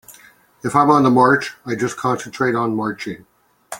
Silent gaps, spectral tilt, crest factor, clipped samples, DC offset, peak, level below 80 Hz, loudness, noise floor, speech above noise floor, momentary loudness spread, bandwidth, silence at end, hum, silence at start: none; -6 dB/octave; 18 dB; under 0.1%; under 0.1%; -2 dBFS; -58 dBFS; -17 LUFS; -49 dBFS; 32 dB; 16 LU; 17 kHz; 0 s; none; 0.1 s